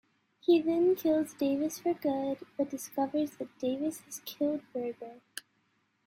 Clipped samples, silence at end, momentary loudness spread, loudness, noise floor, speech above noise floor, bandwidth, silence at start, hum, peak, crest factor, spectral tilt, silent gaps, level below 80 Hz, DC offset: under 0.1%; 0.65 s; 15 LU; -32 LUFS; -74 dBFS; 43 dB; 16 kHz; 0.5 s; none; -16 dBFS; 16 dB; -4.5 dB/octave; none; -76 dBFS; under 0.1%